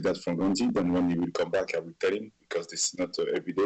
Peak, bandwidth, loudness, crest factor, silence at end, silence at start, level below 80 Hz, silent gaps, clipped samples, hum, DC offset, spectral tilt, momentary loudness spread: -16 dBFS; 8.8 kHz; -29 LUFS; 12 dB; 0 s; 0 s; -60 dBFS; none; under 0.1%; none; under 0.1%; -4.5 dB/octave; 7 LU